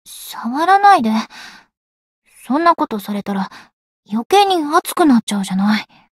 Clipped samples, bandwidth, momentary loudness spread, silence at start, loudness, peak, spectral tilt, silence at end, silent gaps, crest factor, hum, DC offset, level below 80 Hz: under 0.1%; 16 kHz; 14 LU; 0.1 s; -15 LUFS; 0 dBFS; -4.5 dB/octave; 0.35 s; 1.77-2.22 s, 3.73-4.03 s, 4.25-4.30 s, 5.23-5.27 s; 16 dB; none; under 0.1%; -62 dBFS